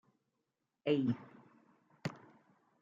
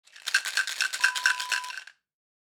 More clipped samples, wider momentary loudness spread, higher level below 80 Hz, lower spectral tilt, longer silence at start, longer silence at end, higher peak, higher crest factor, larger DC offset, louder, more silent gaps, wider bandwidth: neither; first, 22 LU vs 9 LU; about the same, -86 dBFS vs under -90 dBFS; first, -6.5 dB/octave vs 5 dB/octave; first, 0.85 s vs 0.15 s; first, 0.65 s vs 0.5 s; second, -20 dBFS vs -8 dBFS; about the same, 22 dB vs 22 dB; neither; second, -38 LUFS vs -26 LUFS; neither; second, 7.4 kHz vs over 20 kHz